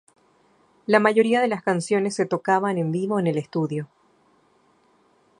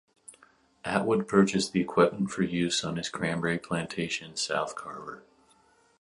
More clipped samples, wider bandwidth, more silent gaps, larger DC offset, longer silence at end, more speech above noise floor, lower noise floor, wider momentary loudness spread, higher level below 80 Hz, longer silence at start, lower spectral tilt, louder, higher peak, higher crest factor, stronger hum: neither; about the same, 11 kHz vs 11.5 kHz; neither; neither; first, 1.55 s vs 0.8 s; first, 40 dB vs 35 dB; about the same, -61 dBFS vs -63 dBFS; second, 10 LU vs 15 LU; second, -72 dBFS vs -62 dBFS; first, 0.9 s vs 0.3 s; first, -6 dB/octave vs -4.5 dB/octave; first, -22 LUFS vs -28 LUFS; first, -2 dBFS vs -8 dBFS; about the same, 22 dB vs 22 dB; neither